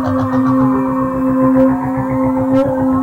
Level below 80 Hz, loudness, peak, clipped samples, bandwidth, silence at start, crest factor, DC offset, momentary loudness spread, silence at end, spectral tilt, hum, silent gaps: -38 dBFS; -14 LUFS; -2 dBFS; under 0.1%; 4.5 kHz; 0 s; 12 dB; under 0.1%; 4 LU; 0 s; -9.5 dB/octave; none; none